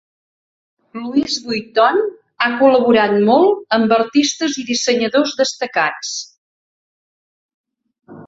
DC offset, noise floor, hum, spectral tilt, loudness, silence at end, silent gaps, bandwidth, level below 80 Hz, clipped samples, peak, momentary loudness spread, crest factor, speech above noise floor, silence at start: under 0.1%; under -90 dBFS; none; -3.5 dB/octave; -16 LUFS; 0 s; 6.38-7.64 s; 8 kHz; -62 dBFS; under 0.1%; -2 dBFS; 12 LU; 16 dB; over 75 dB; 0.95 s